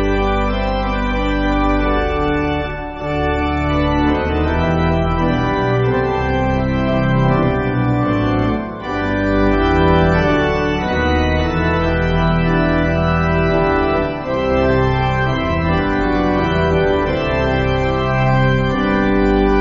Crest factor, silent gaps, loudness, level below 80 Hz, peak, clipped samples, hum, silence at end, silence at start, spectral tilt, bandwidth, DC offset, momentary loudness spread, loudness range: 16 dB; none; -16 LUFS; -24 dBFS; 0 dBFS; under 0.1%; none; 0 s; 0 s; -5.5 dB/octave; 7.4 kHz; under 0.1%; 4 LU; 2 LU